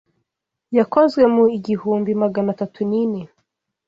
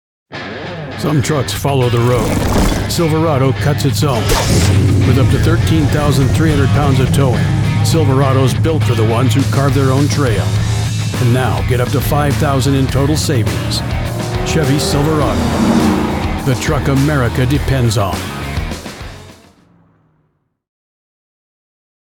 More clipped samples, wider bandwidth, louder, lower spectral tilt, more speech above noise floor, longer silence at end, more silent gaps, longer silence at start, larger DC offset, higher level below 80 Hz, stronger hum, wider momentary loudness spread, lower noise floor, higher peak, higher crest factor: neither; second, 7.6 kHz vs 19 kHz; second, -18 LUFS vs -14 LUFS; first, -8.5 dB/octave vs -6 dB/octave; first, 62 dB vs 50 dB; second, 0.6 s vs 2.8 s; neither; first, 0.7 s vs 0.3 s; neither; second, -60 dBFS vs -26 dBFS; neither; about the same, 9 LU vs 7 LU; first, -79 dBFS vs -62 dBFS; second, -4 dBFS vs 0 dBFS; about the same, 16 dB vs 14 dB